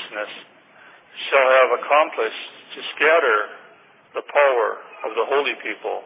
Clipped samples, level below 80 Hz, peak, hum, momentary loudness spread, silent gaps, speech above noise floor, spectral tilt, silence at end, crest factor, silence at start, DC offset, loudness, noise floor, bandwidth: under 0.1%; under -90 dBFS; -2 dBFS; none; 18 LU; none; 31 dB; -5 dB/octave; 0 s; 18 dB; 0 s; under 0.1%; -19 LUFS; -50 dBFS; 4 kHz